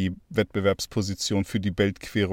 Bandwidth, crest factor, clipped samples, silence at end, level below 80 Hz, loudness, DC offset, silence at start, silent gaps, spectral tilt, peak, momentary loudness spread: 16.5 kHz; 16 dB; under 0.1%; 0 s; -50 dBFS; -26 LUFS; under 0.1%; 0 s; none; -5 dB/octave; -8 dBFS; 3 LU